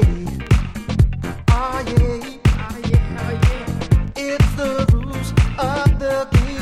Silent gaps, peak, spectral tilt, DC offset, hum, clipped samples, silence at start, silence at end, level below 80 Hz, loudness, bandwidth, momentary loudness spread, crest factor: none; 0 dBFS; -7 dB/octave; under 0.1%; none; under 0.1%; 0 s; 0 s; -22 dBFS; -19 LUFS; 14 kHz; 5 LU; 16 dB